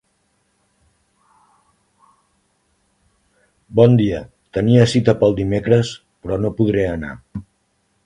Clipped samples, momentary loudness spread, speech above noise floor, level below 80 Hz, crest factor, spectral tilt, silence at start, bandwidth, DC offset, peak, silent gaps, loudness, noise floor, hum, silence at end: under 0.1%; 17 LU; 50 dB; -44 dBFS; 20 dB; -7.5 dB/octave; 3.7 s; 10.5 kHz; under 0.1%; 0 dBFS; none; -17 LUFS; -65 dBFS; none; 0.65 s